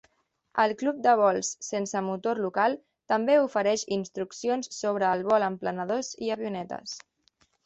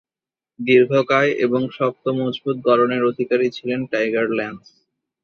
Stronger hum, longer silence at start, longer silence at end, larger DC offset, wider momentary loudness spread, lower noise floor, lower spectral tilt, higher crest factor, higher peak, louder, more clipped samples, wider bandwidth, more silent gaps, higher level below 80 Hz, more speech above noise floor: neither; about the same, 0.55 s vs 0.6 s; about the same, 0.65 s vs 0.65 s; neither; first, 11 LU vs 8 LU; second, -72 dBFS vs under -90 dBFS; second, -4 dB/octave vs -7 dB/octave; about the same, 18 dB vs 18 dB; second, -10 dBFS vs -2 dBFS; second, -27 LUFS vs -19 LUFS; neither; first, 8.4 kHz vs 6.6 kHz; neither; second, -72 dBFS vs -64 dBFS; second, 45 dB vs over 71 dB